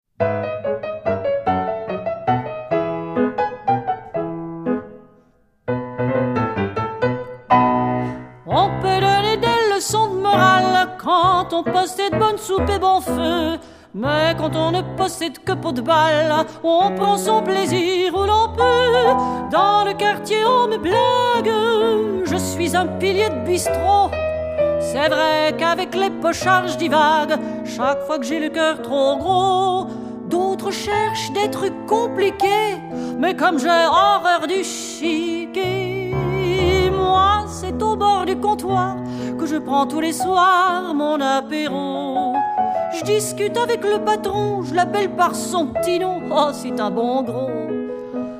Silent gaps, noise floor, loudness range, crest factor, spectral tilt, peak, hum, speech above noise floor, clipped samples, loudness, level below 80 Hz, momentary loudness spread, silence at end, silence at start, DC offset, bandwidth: none; -56 dBFS; 5 LU; 18 dB; -4.5 dB/octave; 0 dBFS; none; 38 dB; under 0.1%; -19 LUFS; -44 dBFS; 9 LU; 0 s; 0.2 s; under 0.1%; 15.5 kHz